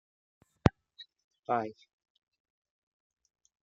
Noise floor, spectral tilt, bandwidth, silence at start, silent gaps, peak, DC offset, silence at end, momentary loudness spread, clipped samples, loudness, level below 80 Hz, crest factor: -57 dBFS; -7.5 dB/octave; 7.8 kHz; 0.65 s; 1.24-1.31 s; -4 dBFS; under 0.1%; 1.9 s; 22 LU; under 0.1%; -33 LUFS; -54 dBFS; 34 dB